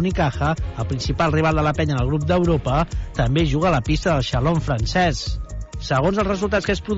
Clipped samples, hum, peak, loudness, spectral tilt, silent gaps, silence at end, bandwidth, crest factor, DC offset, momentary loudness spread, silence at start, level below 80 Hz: under 0.1%; none; -6 dBFS; -20 LUFS; -6.5 dB/octave; none; 0 s; 8 kHz; 12 dB; under 0.1%; 7 LU; 0 s; -30 dBFS